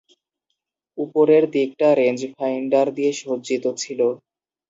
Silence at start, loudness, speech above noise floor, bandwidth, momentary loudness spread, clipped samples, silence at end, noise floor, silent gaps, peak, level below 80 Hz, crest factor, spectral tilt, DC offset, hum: 0.95 s; -20 LUFS; 59 dB; 7.8 kHz; 11 LU; under 0.1%; 0.55 s; -78 dBFS; none; -4 dBFS; -74 dBFS; 16 dB; -5 dB/octave; under 0.1%; none